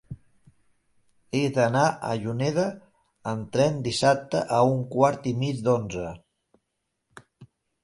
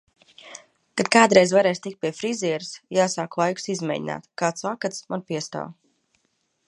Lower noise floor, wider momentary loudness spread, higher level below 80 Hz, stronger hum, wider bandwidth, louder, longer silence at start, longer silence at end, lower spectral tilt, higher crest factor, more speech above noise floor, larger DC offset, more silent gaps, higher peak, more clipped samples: first, -79 dBFS vs -71 dBFS; second, 12 LU vs 18 LU; first, -58 dBFS vs -70 dBFS; neither; about the same, 11.5 kHz vs 11.5 kHz; about the same, -25 LUFS vs -23 LUFS; second, 0.1 s vs 0.45 s; second, 0.4 s vs 0.95 s; first, -6 dB/octave vs -4 dB/octave; about the same, 20 dB vs 24 dB; first, 55 dB vs 49 dB; neither; neither; second, -6 dBFS vs 0 dBFS; neither